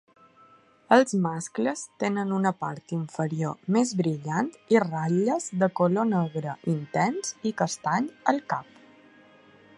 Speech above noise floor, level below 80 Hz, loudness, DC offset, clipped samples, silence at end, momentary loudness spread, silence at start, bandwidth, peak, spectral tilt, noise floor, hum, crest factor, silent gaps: 31 dB; -72 dBFS; -26 LUFS; under 0.1%; under 0.1%; 1.15 s; 8 LU; 0.9 s; 11.5 kHz; -4 dBFS; -6 dB/octave; -57 dBFS; none; 24 dB; none